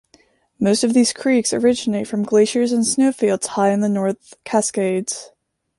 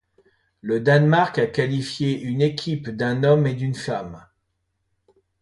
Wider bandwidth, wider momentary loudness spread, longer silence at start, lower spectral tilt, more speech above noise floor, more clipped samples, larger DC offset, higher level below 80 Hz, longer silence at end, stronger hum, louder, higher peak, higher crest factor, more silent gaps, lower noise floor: about the same, 11.5 kHz vs 11.5 kHz; second, 7 LU vs 11 LU; about the same, 0.6 s vs 0.65 s; second, -4.5 dB/octave vs -7 dB/octave; second, 38 dB vs 53 dB; neither; neither; about the same, -62 dBFS vs -58 dBFS; second, 0.5 s vs 1.2 s; neither; first, -18 LUFS vs -21 LUFS; about the same, -4 dBFS vs -4 dBFS; about the same, 14 dB vs 18 dB; neither; second, -56 dBFS vs -74 dBFS